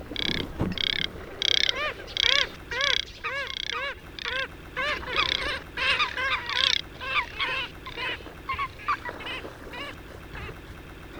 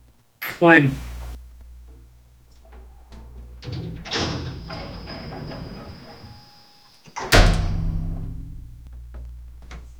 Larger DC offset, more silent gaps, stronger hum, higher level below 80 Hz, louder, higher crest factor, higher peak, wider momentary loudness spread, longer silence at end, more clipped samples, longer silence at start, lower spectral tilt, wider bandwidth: neither; neither; neither; second, -46 dBFS vs -30 dBFS; second, -27 LUFS vs -22 LUFS; about the same, 28 dB vs 24 dB; about the same, -2 dBFS vs 0 dBFS; second, 15 LU vs 26 LU; about the same, 0 s vs 0 s; neither; second, 0 s vs 0.4 s; second, -2.5 dB/octave vs -5 dB/octave; about the same, over 20 kHz vs over 20 kHz